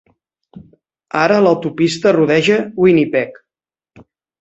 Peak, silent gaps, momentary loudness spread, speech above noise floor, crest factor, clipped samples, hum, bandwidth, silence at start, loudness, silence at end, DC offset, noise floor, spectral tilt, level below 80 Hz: -2 dBFS; none; 7 LU; 76 dB; 14 dB; under 0.1%; none; 8.2 kHz; 0.55 s; -14 LUFS; 1.1 s; under 0.1%; -89 dBFS; -6 dB/octave; -56 dBFS